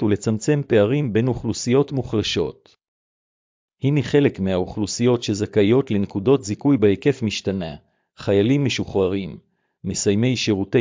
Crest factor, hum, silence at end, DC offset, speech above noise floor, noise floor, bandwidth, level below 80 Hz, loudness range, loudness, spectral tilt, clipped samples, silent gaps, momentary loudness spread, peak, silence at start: 16 dB; none; 0 s; under 0.1%; over 70 dB; under -90 dBFS; 7.6 kHz; -46 dBFS; 3 LU; -20 LUFS; -6 dB/octave; under 0.1%; 2.88-3.68 s; 8 LU; -4 dBFS; 0 s